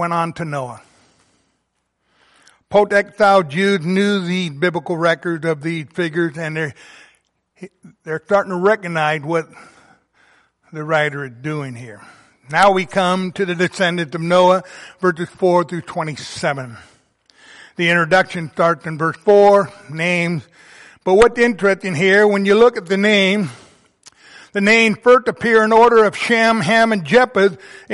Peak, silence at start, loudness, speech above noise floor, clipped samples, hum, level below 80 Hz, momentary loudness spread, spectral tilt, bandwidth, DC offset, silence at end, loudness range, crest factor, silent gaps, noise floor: -2 dBFS; 0 s; -16 LUFS; 54 dB; under 0.1%; none; -52 dBFS; 14 LU; -5.5 dB/octave; 11.5 kHz; under 0.1%; 0 s; 8 LU; 16 dB; none; -70 dBFS